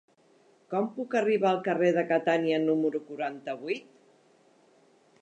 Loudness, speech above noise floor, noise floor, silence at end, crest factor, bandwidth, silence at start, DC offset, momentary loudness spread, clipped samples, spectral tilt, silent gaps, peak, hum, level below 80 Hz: -28 LUFS; 35 dB; -63 dBFS; 1.4 s; 16 dB; 8.8 kHz; 0.7 s; under 0.1%; 10 LU; under 0.1%; -6.5 dB/octave; none; -12 dBFS; none; -86 dBFS